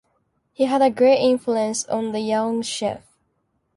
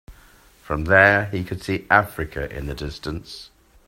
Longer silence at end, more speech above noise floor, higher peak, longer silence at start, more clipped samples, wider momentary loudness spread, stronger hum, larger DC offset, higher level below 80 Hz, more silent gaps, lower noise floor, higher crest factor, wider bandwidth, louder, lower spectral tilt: first, 0.8 s vs 0.4 s; first, 50 dB vs 30 dB; second, -6 dBFS vs 0 dBFS; first, 0.6 s vs 0.1 s; neither; second, 10 LU vs 18 LU; neither; neither; second, -64 dBFS vs -40 dBFS; neither; first, -70 dBFS vs -51 dBFS; second, 16 dB vs 22 dB; second, 11.5 kHz vs 16 kHz; about the same, -20 LUFS vs -20 LUFS; second, -4 dB/octave vs -6 dB/octave